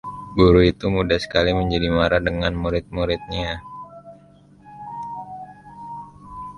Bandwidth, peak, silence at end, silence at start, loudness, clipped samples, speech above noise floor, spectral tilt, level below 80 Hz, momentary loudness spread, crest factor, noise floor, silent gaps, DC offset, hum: 11 kHz; -2 dBFS; 0 s; 0.05 s; -20 LUFS; under 0.1%; 31 dB; -7 dB/octave; -36 dBFS; 23 LU; 20 dB; -50 dBFS; none; under 0.1%; none